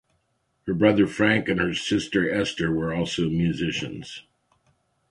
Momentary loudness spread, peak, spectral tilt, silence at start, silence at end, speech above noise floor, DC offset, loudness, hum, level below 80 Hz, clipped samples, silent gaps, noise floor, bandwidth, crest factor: 14 LU; -4 dBFS; -5.5 dB/octave; 0.65 s; 0.9 s; 48 dB; under 0.1%; -24 LUFS; none; -50 dBFS; under 0.1%; none; -72 dBFS; 11.5 kHz; 22 dB